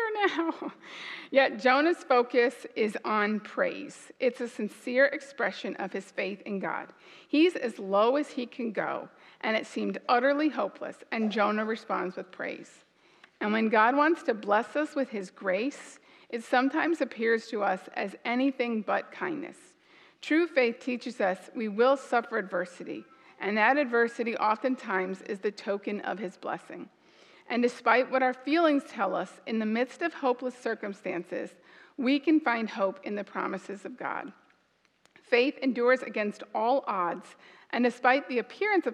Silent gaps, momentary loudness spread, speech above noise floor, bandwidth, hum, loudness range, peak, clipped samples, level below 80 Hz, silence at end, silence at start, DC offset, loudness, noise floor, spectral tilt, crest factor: none; 13 LU; 41 dB; 11.5 kHz; none; 3 LU; -6 dBFS; under 0.1%; -90 dBFS; 0 s; 0 s; under 0.1%; -29 LUFS; -69 dBFS; -5 dB/octave; 22 dB